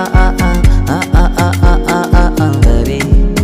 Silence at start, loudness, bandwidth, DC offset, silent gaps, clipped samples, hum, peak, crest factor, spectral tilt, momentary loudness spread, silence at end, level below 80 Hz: 0 s; -12 LUFS; 15.5 kHz; under 0.1%; none; 0.5%; none; 0 dBFS; 8 dB; -6.5 dB/octave; 2 LU; 0 s; -10 dBFS